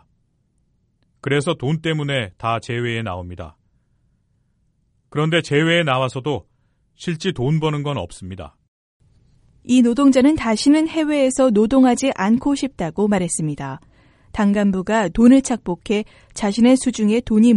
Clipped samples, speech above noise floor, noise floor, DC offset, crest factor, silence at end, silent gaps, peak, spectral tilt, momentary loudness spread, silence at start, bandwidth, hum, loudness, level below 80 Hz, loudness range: under 0.1%; 47 dB; -64 dBFS; under 0.1%; 18 dB; 0 s; 8.68-9.00 s; -2 dBFS; -5.5 dB/octave; 16 LU; 1.25 s; 11.5 kHz; none; -18 LUFS; -46 dBFS; 9 LU